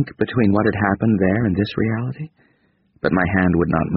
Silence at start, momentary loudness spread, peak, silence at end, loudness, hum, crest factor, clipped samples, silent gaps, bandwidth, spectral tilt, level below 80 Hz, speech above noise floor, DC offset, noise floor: 0 s; 8 LU; -2 dBFS; 0 s; -19 LUFS; none; 18 dB; under 0.1%; none; 5.2 kHz; -7 dB/octave; -42 dBFS; 43 dB; under 0.1%; -61 dBFS